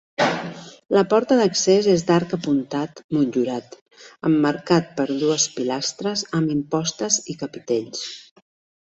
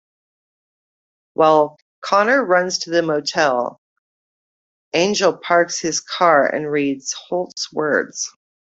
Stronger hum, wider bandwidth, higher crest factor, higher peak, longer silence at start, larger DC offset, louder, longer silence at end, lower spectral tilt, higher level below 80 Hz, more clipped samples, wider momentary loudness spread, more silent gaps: neither; about the same, 8.2 kHz vs 8.2 kHz; about the same, 18 dB vs 18 dB; about the same, -4 dBFS vs -2 dBFS; second, 0.2 s vs 1.4 s; neither; second, -21 LUFS vs -18 LUFS; first, 0.7 s vs 0.5 s; about the same, -4 dB/octave vs -3 dB/octave; about the same, -62 dBFS vs -66 dBFS; neither; about the same, 13 LU vs 11 LU; second, 3.04-3.09 s, 3.81-3.86 s vs 1.82-2.02 s, 3.78-4.91 s